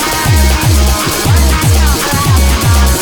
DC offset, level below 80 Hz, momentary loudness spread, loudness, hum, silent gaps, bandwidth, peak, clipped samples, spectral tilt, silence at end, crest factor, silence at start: under 0.1%; -12 dBFS; 1 LU; -10 LUFS; none; none; over 20 kHz; 0 dBFS; under 0.1%; -4 dB/octave; 0 s; 8 dB; 0 s